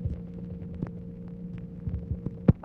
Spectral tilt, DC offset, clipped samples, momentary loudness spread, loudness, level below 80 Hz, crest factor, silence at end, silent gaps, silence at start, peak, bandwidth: -12 dB/octave; under 0.1%; under 0.1%; 13 LU; -35 LUFS; -42 dBFS; 24 dB; 0 s; none; 0 s; -8 dBFS; 4 kHz